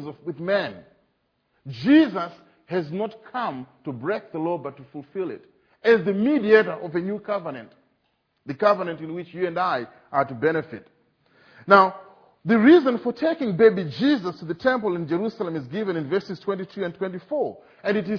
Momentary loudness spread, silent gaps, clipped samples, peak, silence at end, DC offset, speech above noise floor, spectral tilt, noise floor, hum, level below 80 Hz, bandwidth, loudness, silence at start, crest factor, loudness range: 17 LU; none; under 0.1%; 0 dBFS; 0 s; under 0.1%; 48 dB; -8 dB/octave; -71 dBFS; none; -68 dBFS; 5.4 kHz; -23 LUFS; 0 s; 24 dB; 7 LU